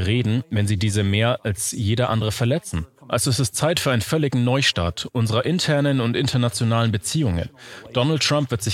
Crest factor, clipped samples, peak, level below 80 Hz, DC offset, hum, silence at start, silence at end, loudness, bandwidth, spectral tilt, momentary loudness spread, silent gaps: 16 dB; under 0.1%; -4 dBFS; -44 dBFS; under 0.1%; none; 0 s; 0 s; -21 LUFS; 15.5 kHz; -5 dB/octave; 6 LU; none